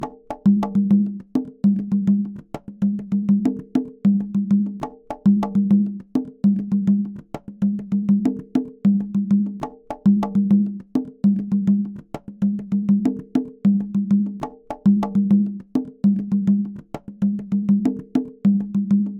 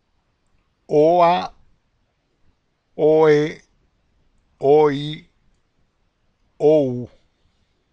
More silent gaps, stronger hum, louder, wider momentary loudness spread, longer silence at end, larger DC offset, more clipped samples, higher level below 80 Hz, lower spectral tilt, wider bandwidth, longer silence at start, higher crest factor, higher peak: neither; neither; second, -21 LUFS vs -17 LUFS; second, 10 LU vs 21 LU; second, 0 s vs 0.85 s; neither; neither; about the same, -56 dBFS vs -58 dBFS; first, -10 dB/octave vs -7.5 dB/octave; second, 4.1 kHz vs 6.8 kHz; second, 0 s vs 0.9 s; about the same, 14 dB vs 18 dB; about the same, -6 dBFS vs -4 dBFS